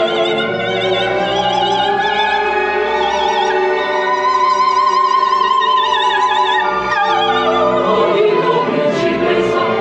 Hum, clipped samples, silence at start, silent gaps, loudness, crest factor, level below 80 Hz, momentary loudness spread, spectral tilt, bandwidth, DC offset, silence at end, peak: none; under 0.1%; 0 s; none; -14 LUFS; 12 dB; -48 dBFS; 3 LU; -4 dB/octave; 8.6 kHz; under 0.1%; 0 s; -2 dBFS